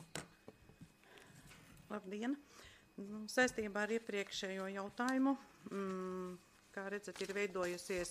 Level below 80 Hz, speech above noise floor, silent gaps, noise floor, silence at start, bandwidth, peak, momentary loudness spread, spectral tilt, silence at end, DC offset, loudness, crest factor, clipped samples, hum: -72 dBFS; 22 dB; none; -63 dBFS; 0 s; 15.5 kHz; -20 dBFS; 24 LU; -4 dB/octave; 0 s; under 0.1%; -41 LUFS; 22 dB; under 0.1%; none